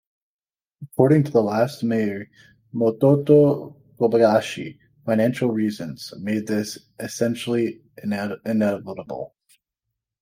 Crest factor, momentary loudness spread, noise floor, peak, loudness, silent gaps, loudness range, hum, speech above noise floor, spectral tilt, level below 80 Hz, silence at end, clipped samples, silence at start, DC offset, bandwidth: 20 dB; 17 LU; under -90 dBFS; -2 dBFS; -21 LUFS; none; 6 LU; none; over 69 dB; -7 dB/octave; -64 dBFS; 0.95 s; under 0.1%; 0.8 s; under 0.1%; 16 kHz